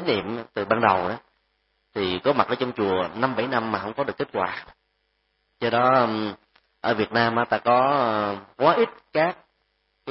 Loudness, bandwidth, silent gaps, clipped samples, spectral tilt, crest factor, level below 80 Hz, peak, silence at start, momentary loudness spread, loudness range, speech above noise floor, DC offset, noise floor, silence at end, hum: -23 LUFS; 5.8 kHz; none; under 0.1%; -9.5 dB/octave; 22 dB; -62 dBFS; -2 dBFS; 0 s; 11 LU; 3 LU; 49 dB; under 0.1%; -72 dBFS; 0 s; none